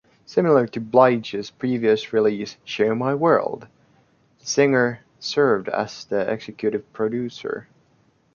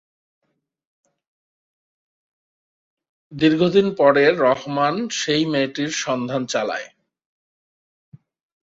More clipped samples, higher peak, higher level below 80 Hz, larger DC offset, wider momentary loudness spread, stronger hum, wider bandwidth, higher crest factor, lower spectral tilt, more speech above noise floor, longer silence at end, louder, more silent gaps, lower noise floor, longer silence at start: neither; about the same, 0 dBFS vs -2 dBFS; about the same, -64 dBFS vs -64 dBFS; neither; first, 13 LU vs 8 LU; neither; second, 7.2 kHz vs 8 kHz; about the same, 20 dB vs 20 dB; about the same, -5.5 dB/octave vs -4.5 dB/octave; second, 40 dB vs over 71 dB; second, 0.7 s vs 1.75 s; second, -22 LUFS vs -19 LUFS; neither; second, -61 dBFS vs under -90 dBFS; second, 0.3 s vs 3.3 s